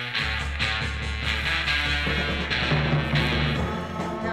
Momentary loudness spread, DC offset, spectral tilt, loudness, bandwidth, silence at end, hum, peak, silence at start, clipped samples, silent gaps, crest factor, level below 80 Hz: 6 LU; under 0.1%; -5 dB/octave; -25 LUFS; 14 kHz; 0 s; none; -10 dBFS; 0 s; under 0.1%; none; 14 dB; -34 dBFS